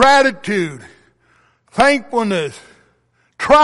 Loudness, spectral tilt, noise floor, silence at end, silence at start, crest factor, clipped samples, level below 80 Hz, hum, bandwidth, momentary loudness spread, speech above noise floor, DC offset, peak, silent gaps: -16 LUFS; -4 dB/octave; -60 dBFS; 0 s; 0 s; 14 dB; under 0.1%; -46 dBFS; none; 11.5 kHz; 14 LU; 45 dB; under 0.1%; -2 dBFS; none